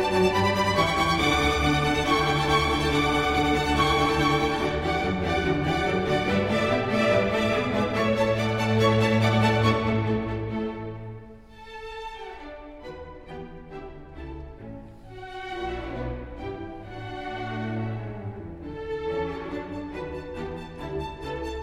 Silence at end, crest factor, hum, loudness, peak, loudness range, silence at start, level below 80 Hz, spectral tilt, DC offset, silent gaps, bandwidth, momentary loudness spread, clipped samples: 0 s; 16 dB; none; -25 LUFS; -10 dBFS; 17 LU; 0 s; -42 dBFS; -5.5 dB/octave; under 0.1%; none; 16 kHz; 19 LU; under 0.1%